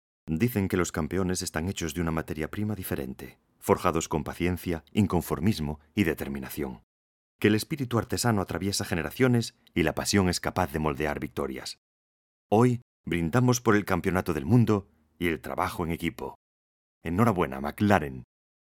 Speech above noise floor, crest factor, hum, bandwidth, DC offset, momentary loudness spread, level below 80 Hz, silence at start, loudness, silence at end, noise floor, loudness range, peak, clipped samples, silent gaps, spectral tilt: over 63 dB; 24 dB; none; 18 kHz; under 0.1%; 10 LU; -50 dBFS; 0.25 s; -28 LUFS; 0.5 s; under -90 dBFS; 4 LU; -4 dBFS; under 0.1%; 6.83-7.39 s, 11.78-12.50 s, 12.82-13.04 s, 16.35-17.01 s; -5.5 dB/octave